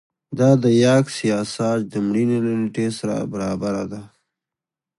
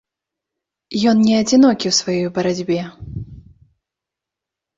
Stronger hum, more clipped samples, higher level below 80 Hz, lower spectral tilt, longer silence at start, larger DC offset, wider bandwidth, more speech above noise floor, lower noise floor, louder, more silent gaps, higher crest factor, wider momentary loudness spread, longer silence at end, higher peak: neither; neither; second, -56 dBFS vs -48 dBFS; first, -6.5 dB/octave vs -4.5 dB/octave; second, 0.3 s vs 0.9 s; neither; first, 11.5 kHz vs 7.8 kHz; about the same, 69 dB vs 69 dB; about the same, -88 dBFS vs -85 dBFS; second, -20 LUFS vs -16 LUFS; neither; about the same, 18 dB vs 16 dB; second, 10 LU vs 19 LU; second, 0.95 s vs 1.4 s; about the same, -2 dBFS vs -4 dBFS